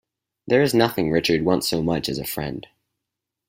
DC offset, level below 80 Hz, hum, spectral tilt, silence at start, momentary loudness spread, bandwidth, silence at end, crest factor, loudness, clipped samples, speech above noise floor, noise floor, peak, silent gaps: under 0.1%; -50 dBFS; none; -5 dB/octave; 0.45 s; 10 LU; 16 kHz; 0.85 s; 20 dB; -21 LUFS; under 0.1%; 63 dB; -84 dBFS; -2 dBFS; none